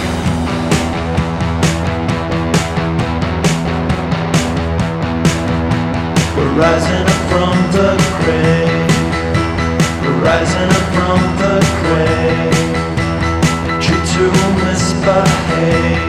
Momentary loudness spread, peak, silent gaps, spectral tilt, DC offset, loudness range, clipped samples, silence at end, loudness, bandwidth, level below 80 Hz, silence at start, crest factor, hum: 5 LU; 0 dBFS; none; -5.5 dB/octave; under 0.1%; 3 LU; under 0.1%; 0 s; -14 LUFS; 14 kHz; -28 dBFS; 0 s; 14 dB; none